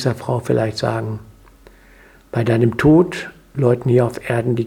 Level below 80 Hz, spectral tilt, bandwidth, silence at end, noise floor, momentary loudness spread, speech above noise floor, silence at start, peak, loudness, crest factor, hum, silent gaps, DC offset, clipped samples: -44 dBFS; -7.5 dB/octave; 13.5 kHz; 0 s; -47 dBFS; 15 LU; 30 dB; 0 s; 0 dBFS; -18 LUFS; 18 dB; none; none; under 0.1%; under 0.1%